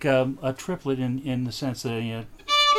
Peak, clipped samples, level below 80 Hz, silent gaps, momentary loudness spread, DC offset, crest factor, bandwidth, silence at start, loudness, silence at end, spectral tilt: -10 dBFS; under 0.1%; -52 dBFS; none; 8 LU; under 0.1%; 16 dB; 15 kHz; 0 s; -27 LUFS; 0 s; -4.5 dB/octave